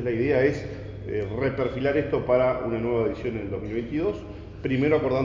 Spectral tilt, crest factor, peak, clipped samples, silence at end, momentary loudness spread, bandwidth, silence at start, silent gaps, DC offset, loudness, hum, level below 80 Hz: -8.5 dB/octave; 18 dB; -8 dBFS; under 0.1%; 0 s; 11 LU; 7.4 kHz; 0 s; none; under 0.1%; -26 LUFS; none; -44 dBFS